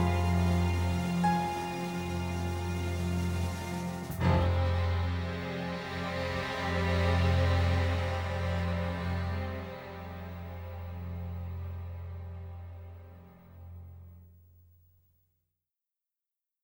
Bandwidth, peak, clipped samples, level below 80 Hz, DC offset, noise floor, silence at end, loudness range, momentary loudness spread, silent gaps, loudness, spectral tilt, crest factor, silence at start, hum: 16.5 kHz; -14 dBFS; under 0.1%; -44 dBFS; under 0.1%; under -90 dBFS; 2.35 s; 15 LU; 17 LU; none; -32 LUFS; -6.5 dB/octave; 18 dB; 0 s; none